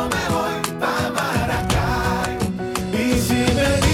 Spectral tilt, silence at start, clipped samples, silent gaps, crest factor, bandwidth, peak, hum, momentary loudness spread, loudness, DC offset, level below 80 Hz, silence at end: -5 dB/octave; 0 s; under 0.1%; none; 16 dB; 17.5 kHz; -4 dBFS; none; 6 LU; -21 LUFS; under 0.1%; -32 dBFS; 0 s